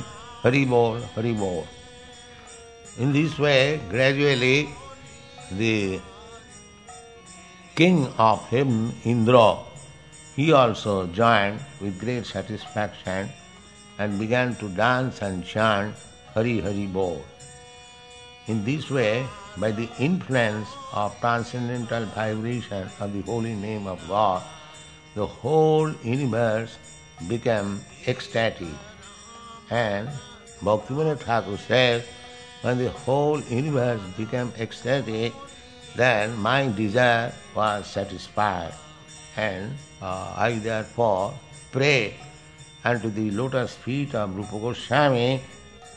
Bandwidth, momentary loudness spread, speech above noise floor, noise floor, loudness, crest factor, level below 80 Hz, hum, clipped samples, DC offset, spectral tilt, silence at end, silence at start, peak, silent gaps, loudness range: 10 kHz; 23 LU; 24 dB; -47 dBFS; -24 LUFS; 24 dB; -54 dBFS; none; under 0.1%; 0.1%; -6 dB/octave; 0 s; 0 s; -2 dBFS; none; 7 LU